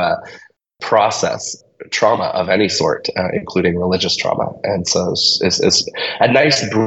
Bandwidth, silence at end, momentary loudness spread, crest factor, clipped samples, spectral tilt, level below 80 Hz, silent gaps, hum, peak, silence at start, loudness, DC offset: 8.4 kHz; 0 s; 9 LU; 16 dB; under 0.1%; -3.5 dB/octave; -50 dBFS; none; none; 0 dBFS; 0 s; -16 LUFS; under 0.1%